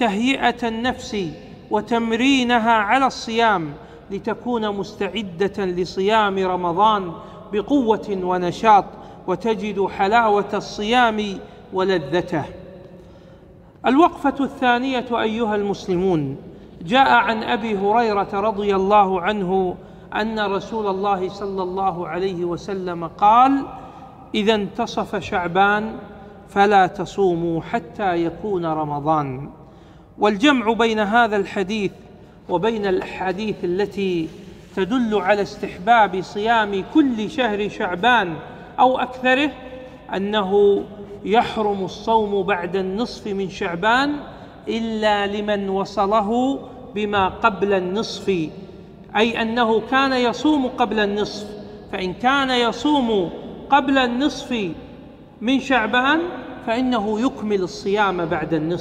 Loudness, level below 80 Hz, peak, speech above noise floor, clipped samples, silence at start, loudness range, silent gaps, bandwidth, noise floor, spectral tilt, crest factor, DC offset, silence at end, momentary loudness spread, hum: -20 LUFS; -48 dBFS; -2 dBFS; 26 dB; under 0.1%; 0 s; 3 LU; none; 10.5 kHz; -45 dBFS; -5.5 dB/octave; 18 dB; under 0.1%; 0 s; 12 LU; none